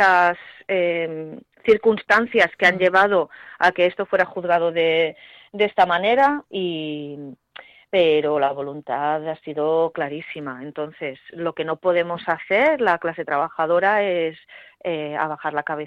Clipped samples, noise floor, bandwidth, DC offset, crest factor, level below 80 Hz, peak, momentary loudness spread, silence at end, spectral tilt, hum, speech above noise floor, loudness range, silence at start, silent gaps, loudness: under 0.1%; -46 dBFS; 10 kHz; under 0.1%; 16 dB; -64 dBFS; -4 dBFS; 14 LU; 0 s; -5.5 dB/octave; none; 25 dB; 6 LU; 0 s; none; -20 LUFS